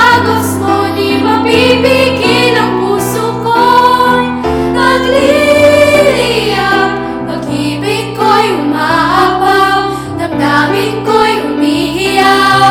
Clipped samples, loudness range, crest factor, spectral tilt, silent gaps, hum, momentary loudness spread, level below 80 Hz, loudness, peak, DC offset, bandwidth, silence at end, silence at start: 0.7%; 3 LU; 10 dB; -4.5 dB/octave; none; none; 7 LU; -36 dBFS; -9 LUFS; 0 dBFS; under 0.1%; over 20 kHz; 0 s; 0 s